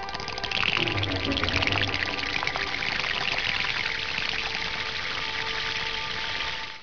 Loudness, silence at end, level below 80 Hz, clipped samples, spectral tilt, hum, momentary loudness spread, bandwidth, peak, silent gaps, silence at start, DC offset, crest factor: -26 LUFS; 0 s; -46 dBFS; under 0.1%; -3 dB/octave; none; 5 LU; 5.4 kHz; -8 dBFS; none; 0 s; 0.9%; 20 dB